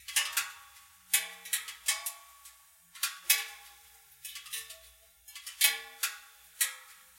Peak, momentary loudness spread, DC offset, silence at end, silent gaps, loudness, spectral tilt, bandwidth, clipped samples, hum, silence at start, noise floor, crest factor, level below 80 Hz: -8 dBFS; 23 LU; under 0.1%; 0.2 s; none; -31 LUFS; 4.5 dB/octave; 17 kHz; under 0.1%; none; 0 s; -59 dBFS; 28 dB; -76 dBFS